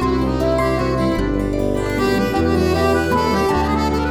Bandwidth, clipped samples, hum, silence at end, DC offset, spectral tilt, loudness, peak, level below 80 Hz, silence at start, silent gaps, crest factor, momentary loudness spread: 19.5 kHz; under 0.1%; none; 0 s; under 0.1%; -6.5 dB/octave; -18 LUFS; -4 dBFS; -28 dBFS; 0 s; none; 14 dB; 3 LU